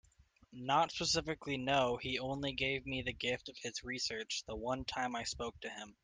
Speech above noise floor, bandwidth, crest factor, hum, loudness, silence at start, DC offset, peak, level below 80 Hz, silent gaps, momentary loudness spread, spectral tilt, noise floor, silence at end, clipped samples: 29 dB; 10.5 kHz; 18 dB; none; -37 LUFS; 0.5 s; under 0.1%; -20 dBFS; -60 dBFS; none; 10 LU; -3 dB/octave; -68 dBFS; 0.1 s; under 0.1%